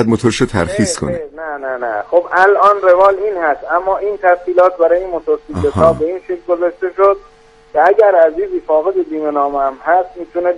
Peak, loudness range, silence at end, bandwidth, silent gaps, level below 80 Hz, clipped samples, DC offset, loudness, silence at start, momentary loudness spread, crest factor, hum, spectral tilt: 0 dBFS; 2 LU; 0 s; 11.5 kHz; none; -42 dBFS; under 0.1%; under 0.1%; -14 LUFS; 0 s; 11 LU; 14 dB; none; -5.5 dB/octave